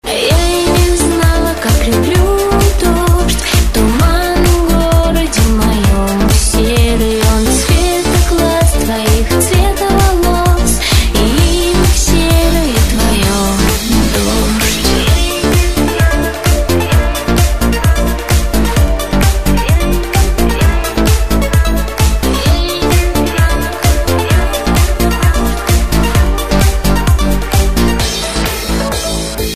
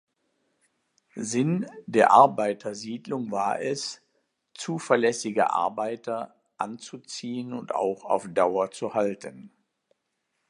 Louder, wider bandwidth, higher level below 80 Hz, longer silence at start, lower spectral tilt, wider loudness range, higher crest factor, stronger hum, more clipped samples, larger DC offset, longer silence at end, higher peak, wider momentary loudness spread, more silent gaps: first, -12 LUFS vs -26 LUFS; first, 15.5 kHz vs 11.5 kHz; first, -14 dBFS vs -76 dBFS; second, 0 s vs 1.15 s; about the same, -4.5 dB/octave vs -5 dB/octave; second, 2 LU vs 5 LU; second, 10 dB vs 24 dB; neither; neither; first, 3% vs under 0.1%; second, 0 s vs 1 s; about the same, 0 dBFS vs -2 dBFS; second, 3 LU vs 15 LU; neither